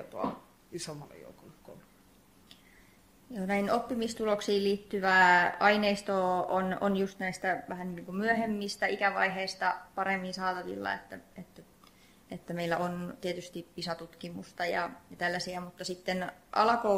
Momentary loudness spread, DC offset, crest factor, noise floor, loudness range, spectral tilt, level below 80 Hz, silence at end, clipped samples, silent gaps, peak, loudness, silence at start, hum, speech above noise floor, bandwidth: 18 LU; under 0.1%; 22 dB; -61 dBFS; 11 LU; -4.5 dB/octave; -66 dBFS; 0 s; under 0.1%; none; -10 dBFS; -31 LUFS; 0 s; none; 30 dB; 16 kHz